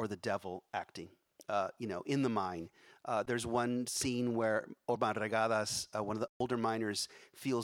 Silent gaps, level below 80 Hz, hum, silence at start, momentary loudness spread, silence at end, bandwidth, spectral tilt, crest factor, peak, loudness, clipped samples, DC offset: 6.29-6.40 s; -70 dBFS; none; 0 s; 10 LU; 0 s; 17 kHz; -4.5 dB/octave; 20 dB; -18 dBFS; -36 LUFS; under 0.1%; under 0.1%